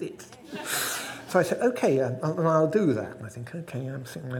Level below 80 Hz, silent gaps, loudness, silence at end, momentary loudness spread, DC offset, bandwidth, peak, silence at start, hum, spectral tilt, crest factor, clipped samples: -68 dBFS; none; -26 LUFS; 0 s; 15 LU; under 0.1%; 19 kHz; -8 dBFS; 0 s; none; -5 dB/octave; 20 dB; under 0.1%